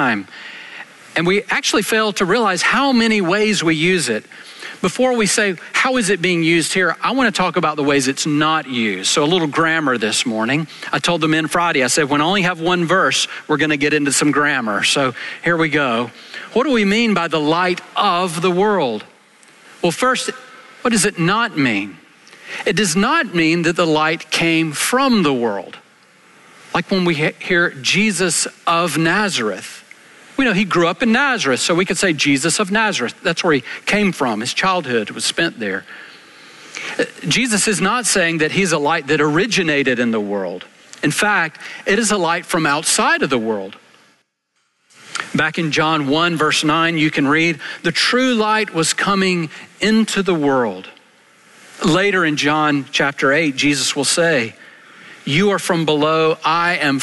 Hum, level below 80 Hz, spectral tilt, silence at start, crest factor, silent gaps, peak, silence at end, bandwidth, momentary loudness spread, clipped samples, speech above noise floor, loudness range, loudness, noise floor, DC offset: none; -54 dBFS; -3.5 dB/octave; 0 s; 14 dB; none; -4 dBFS; 0 s; 12.5 kHz; 8 LU; under 0.1%; 51 dB; 3 LU; -16 LUFS; -68 dBFS; under 0.1%